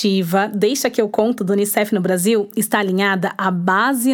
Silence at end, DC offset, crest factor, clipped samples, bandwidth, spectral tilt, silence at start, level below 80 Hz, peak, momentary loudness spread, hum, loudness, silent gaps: 0 s; under 0.1%; 16 dB; under 0.1%; 19.5 kHz; -4.5 dB/octave; 0 s; -66 dBFS; -2 dBFS; 2 LU; none; -17 LUFS; none